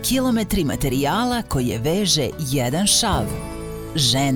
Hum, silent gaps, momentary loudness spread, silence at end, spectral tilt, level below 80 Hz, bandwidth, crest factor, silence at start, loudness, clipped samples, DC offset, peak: none; none; 11 LU; 0 s; -4 dB/octave; -36 dBFS; over 20 kHz; 14 dB; 0 s; -20 LUFS; under 0.1%; 0.3%; -6 dBFS